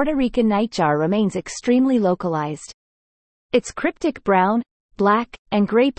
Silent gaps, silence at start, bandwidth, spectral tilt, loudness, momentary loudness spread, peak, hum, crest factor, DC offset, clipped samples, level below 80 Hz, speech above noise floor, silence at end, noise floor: 2.74-3.49 s, 4.71-4.89 s, 5.39-5.45 s; 0 s; 8.8 kHz; -6 dB/octave; -20 LUFS; 8 LU; -4 dBFS; none; 16 dB; under 0.1%; under 0.1%; -48 dBFS; over 71 dB; 0.1 s; under -90 dBFS